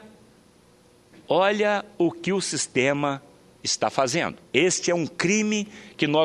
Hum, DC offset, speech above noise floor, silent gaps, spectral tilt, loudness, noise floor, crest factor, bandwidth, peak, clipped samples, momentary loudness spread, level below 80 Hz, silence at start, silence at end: none; under 0.1%; 32 dB; none; -3.5 dB/octave; -24 LUFS; -56 dBFS; 22 dB; 12.5 kHz; -2 dBFS; under 0.1%; 7 LU; -66 dBFS; 0.05 s; 0 s